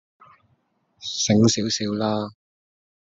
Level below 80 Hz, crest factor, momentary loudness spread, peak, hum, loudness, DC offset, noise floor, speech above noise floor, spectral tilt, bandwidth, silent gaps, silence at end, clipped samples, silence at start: -60 dBFS; 20 dB; 15 LU; -4 dBFS; none; -22 LUFS; under 0.1%; -67 dBFS; 46 dB; -4.5 dB/octave; 8 kHz; none; 0.8 s; under 0.1%; 1 s